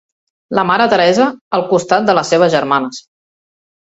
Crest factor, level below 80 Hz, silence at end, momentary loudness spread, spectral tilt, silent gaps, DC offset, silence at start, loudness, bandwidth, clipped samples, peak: 14 dB; -56 dBFS; 0.85 s; 8 LU; -4.5 dB/octave; 1.41-1.51 s; under 0.1%; 0.5 s; -13 LUFS; 8 kHz; under 0.1%; 0 dBFS